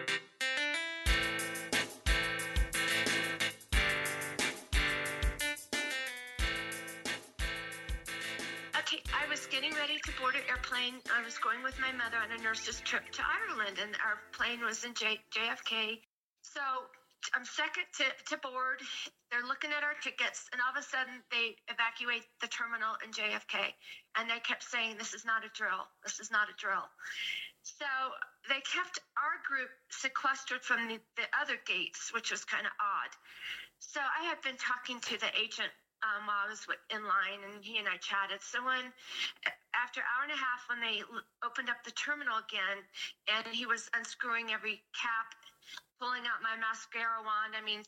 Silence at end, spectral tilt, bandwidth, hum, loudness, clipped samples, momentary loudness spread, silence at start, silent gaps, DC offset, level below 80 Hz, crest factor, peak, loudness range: 0 s; -2 dB/octave; 16.5 kHz; none; -35 LUFS; under 0.1%; 7 LU; 0 s; 16.07-16.36 s; under 0.1%; -48 dBFS; 20 dB; -18 dBFS; 4 LU